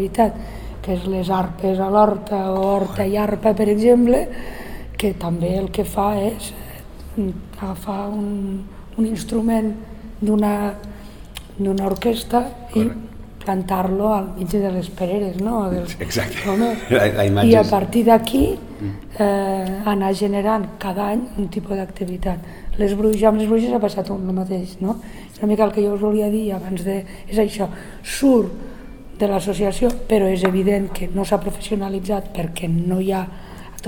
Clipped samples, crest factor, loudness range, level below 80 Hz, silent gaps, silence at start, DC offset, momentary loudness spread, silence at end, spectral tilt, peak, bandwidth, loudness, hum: under 0.1%; 20 dB; 6 LU; -36 dBFS; none; 0 s; 0.4%; 15 LU; 0 s; -6.5 dB/octave; 0 dBFS; 19.5 kHz; -20 LUFS; none